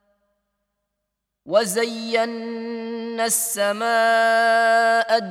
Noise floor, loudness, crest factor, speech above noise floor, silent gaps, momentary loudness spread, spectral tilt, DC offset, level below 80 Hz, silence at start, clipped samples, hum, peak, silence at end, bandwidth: -80 dBFS; -20 LUFS; 18 dB; 60 dB; none; 13 LU; -2 dB/octave; under 0.1%; -76 dBFS; 1.45 s; under 0.1%; none; -4 dBFS; 0 s; 16.5 kHz